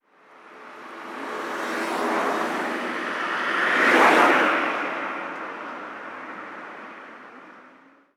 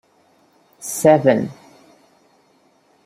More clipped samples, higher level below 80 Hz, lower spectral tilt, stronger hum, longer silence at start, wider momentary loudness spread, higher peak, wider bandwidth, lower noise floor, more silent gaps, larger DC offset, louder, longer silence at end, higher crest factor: neither; second, -78 dBFS vs -66 dBFS; second, -3 dB/octave vs -5.5 dB/octave; neither; second, 0.35 s vs 0.8 s; first, 24 LU vs 17 LU; about the same, -4 dBFS vs -2 dBFS; about the same, 17.5 kHz vs 16 kHz; second, -53 dBFS vs -58 dBFS; neither; neither; second, -22 LUFS vs -17 LUFS; second, 0.45 s vs 1.55 s; about the same, 22 dB vs 20 dB